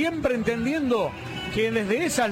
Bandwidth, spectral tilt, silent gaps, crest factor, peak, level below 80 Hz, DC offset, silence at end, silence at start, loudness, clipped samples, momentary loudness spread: 16 kHz; -4.5 dB/octave; none; 14 dB; -10 dBFS; -48 dBFS; under 0.1%; 0 s; 0 s; -25 LUFS; under 0.1%; 6 LU